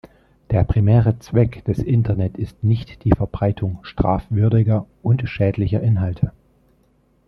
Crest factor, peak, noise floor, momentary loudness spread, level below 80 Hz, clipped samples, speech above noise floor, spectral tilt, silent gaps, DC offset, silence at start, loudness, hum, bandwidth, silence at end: 18 dB; 0 dBFS; -59 dBFS; 7 LU; -36 dBFS; under 0.1%; 41 dB; -10 dB/octave; none; under 0.1%; 0.5 s; -20 LUFS; none; 6.2 kHz; 1 s